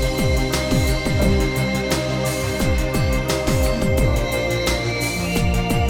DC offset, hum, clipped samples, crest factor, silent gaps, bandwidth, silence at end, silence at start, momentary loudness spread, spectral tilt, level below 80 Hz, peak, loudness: under 0.1%; none; under 0.1%; 14 dB; none; 18 kHz; 0 s; 0 s; 2 LU; -5 dB/octave; -24 dBFS; -4 dBFS; -20 LUFS